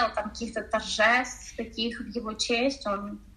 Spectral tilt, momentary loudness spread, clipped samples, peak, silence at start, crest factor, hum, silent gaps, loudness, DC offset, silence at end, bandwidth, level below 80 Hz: -2.5 dB/octave; 13 LU; under 0.1%; -10 dBFS; 0 s; 20 dB; none; none; -28 LUFS; under 0.1%; 0.05 s; 13 kHz; -52 dBFS